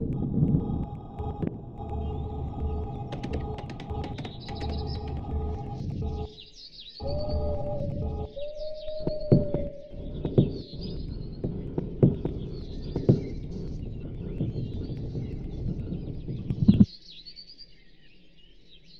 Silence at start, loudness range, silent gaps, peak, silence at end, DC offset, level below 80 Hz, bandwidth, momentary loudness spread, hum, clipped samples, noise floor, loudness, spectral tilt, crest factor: 0 s; 6 LU; none; -4 dBFS; 0 s; 0.2%; -38 dBFS; 6.8 kHz; 14 LU; none; under 0.1%; -56 dBFS; -31 LUFS; -9.5 dB/octave; 26 dB